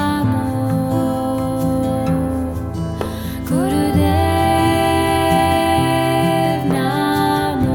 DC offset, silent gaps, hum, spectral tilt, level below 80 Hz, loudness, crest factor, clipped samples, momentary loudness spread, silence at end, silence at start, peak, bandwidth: under 0.1%; none; none; -6 dB/octave; -34 dBFS; -17 LUFS; 14 dB; under 0.1%; 8 LU; 0 s; 0 s; -4 dBFS; 18 kHz